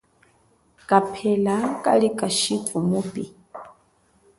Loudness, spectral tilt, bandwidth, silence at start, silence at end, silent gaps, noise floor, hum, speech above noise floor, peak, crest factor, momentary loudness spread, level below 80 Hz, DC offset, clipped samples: -22 LUFS; -4.5 dB/octave; 11.5 kHz; 0.9 s; 0.7 s; none; -61 dBFS; none; 40 dB; -2 dBFS; 22 dB; 18 LU; -62 dBFS; under 0.1%; under 0.1%